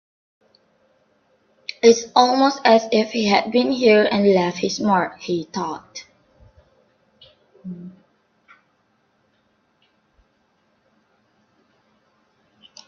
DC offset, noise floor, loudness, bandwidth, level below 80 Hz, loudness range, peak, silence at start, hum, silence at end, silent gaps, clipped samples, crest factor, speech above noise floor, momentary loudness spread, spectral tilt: under 0.1%; -65 dBFS; -18 LUFS; 7 kHz; -64 dBFS; 16 LU; 0 dBFS; 1.85 s; none; 4.95 s; none; under 0.1%; 22 dB; 47 dB; 21 LU; -4.5 dB/octave